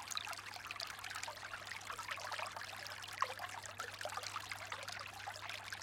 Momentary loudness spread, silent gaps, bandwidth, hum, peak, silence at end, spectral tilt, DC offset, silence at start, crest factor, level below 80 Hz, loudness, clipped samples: 5 LU; none; 17 kHz; none; -22 dBFS; 0 s; -1 dB/octave; under 0.1%; 0 s; 26 dB; -74 dBFS; -45 LUFS; under 0.1%